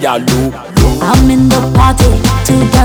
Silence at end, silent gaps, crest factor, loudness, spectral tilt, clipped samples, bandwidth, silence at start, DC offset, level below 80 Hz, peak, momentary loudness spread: 0 s; none; 8 dB; -9 LUFS; -5.5 dB/octave; 0.7%; 19 kHz; 0 s; under 0.1%; -16 dBFS; 0 dBFS; 5 LU